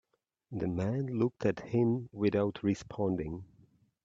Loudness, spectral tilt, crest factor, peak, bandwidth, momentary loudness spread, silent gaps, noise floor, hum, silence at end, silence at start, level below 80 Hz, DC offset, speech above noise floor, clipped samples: -33 LUFS; -8 dB/octave; 18 dB; -16 dBFS; 7.8 kHz; 8 LU; none; -65 dBFS; none; 0.6 s; 0.5 s; -62 dBFS; under 0.1%; 33 dB; under 0.1%